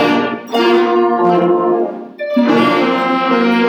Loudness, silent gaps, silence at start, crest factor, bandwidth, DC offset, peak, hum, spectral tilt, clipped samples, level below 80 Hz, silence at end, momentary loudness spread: -13 LUFS; none; 0 s; 12 dB; 15 kHz; under 0.1%; 0 dBFS; none; -6.5 dB/octave; under 0.1%; -66 dBFS; 0 s; 6 LU